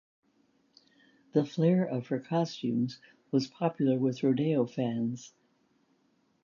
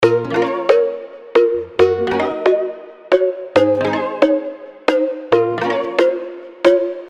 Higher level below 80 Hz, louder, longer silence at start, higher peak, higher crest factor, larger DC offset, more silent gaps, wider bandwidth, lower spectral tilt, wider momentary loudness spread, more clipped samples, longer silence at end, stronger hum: second, -76 dBFS vs -56 dBFS; second, -30 LUFS vs -17 LUFS; first, 1.35 s vs 0 s; second, -12 dBFS vs 0 dBFS; about the same, 18 dB vs 16 dB; neither; neither; second, 7.4 kHz vs 9.4 kHz; first, -7.5 dB/octave vs -6 dB/octave; about the same, 7 LU vs 7 LU; neither; first, 1.15 s vs 0 s; neither